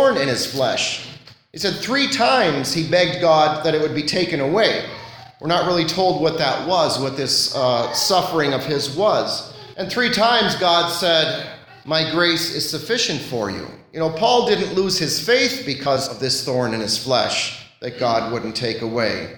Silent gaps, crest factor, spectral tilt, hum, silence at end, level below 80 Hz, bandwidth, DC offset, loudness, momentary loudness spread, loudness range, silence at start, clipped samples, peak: none; 16 dB; -3.5 dB/octave; none; 0 s; -56 dBFS; 19 kHz; under 0.1%; -19 LUFS; 10 LU; 2 LU; 0 s; under 0.1%; -2 dBFS